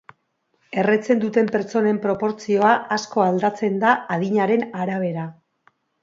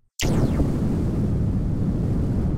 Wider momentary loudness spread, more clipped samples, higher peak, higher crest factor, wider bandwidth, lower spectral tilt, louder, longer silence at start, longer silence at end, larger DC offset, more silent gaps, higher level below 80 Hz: first, 7 LU vs 2 LU; neither; first, -2 dBFS vs -10 dBFS; first, 18 dB vs 12 dB; second, 7.8 kHz vs 16 kHz; about the same, -6.5 dB/octave vs -7 dB/octave; about the same, -21 LUFS vs -23 LUFS; first, 0.7 s vs 0.2 s; first, 0.7 s vs 0 s; neither; neither; second, -68 dBFS vs -28 dBFS